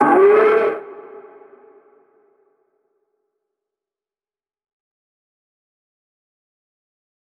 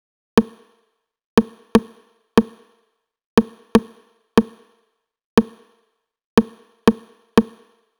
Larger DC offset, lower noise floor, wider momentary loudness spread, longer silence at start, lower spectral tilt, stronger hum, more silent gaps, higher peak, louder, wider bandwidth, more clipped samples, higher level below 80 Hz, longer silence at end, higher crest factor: neither; first, under -90 dBFS vs -69 dBFS; first, 26 LU vs 14 LU; second, 0 s vs 0.35 s; about the same, -7 dB/octave vs -6 dB/octave; neither; second, none vs 1.24-1.37 s, 3.26-3.37 s, 5.24-5.37 s, 6.24-6.37 s; second, -4 dBFS vs 0 dBFS; first, -14 LUFS vs -20 LUFS; second, 4.6 kHz vs over 20 kHz; neither; second, -74 dBFS vs -46 dBFS; first, 6.4 s vs 0.55 s; about the same, 18 dB vs 22 dB